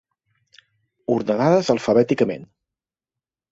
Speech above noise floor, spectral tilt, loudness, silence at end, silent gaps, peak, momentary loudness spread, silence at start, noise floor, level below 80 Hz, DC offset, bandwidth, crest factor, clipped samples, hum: 70 dB; -6.5 dB/octave; -19 LUFS; 1.05 s; none; -4 dBFS; 11 LU; 1.1 s; -89 dBFS; -60 dBFS; under 0.1%; 8 kHz; 18 dB; under 0.1%; none